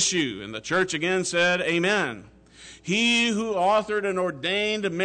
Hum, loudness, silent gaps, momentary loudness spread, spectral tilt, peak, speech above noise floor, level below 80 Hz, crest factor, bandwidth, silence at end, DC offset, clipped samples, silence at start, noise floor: none; -23 LUFS; none; 8 LU; -3 dB/octave; -12 dBFS; 24 dB; -60 dBFS; 12 dB; 9.4 kHz; 0 s; under 0.1%; under 0.1%; 0 s; -48 dBFS